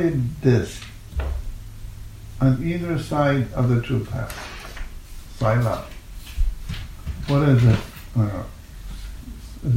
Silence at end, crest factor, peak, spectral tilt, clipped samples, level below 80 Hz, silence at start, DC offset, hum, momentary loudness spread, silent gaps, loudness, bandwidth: 0 s; 18 dB; -4 dBFS; -7.5 dB/octave; under 0.1%; -32 dBFS; 0 s; under 0.1%; none; 20 LU; none; -23 LUFS; 16 kHz